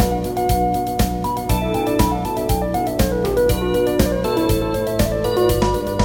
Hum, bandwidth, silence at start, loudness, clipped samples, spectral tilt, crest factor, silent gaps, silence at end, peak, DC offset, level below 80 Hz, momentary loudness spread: none; 17 kHz; 0 s; -19 LUFS; under 0.1%; -6 dB/octave; 18 dB; none; 0 s; 0 dBFS; 0.2%; -28 dBFS; 3 LU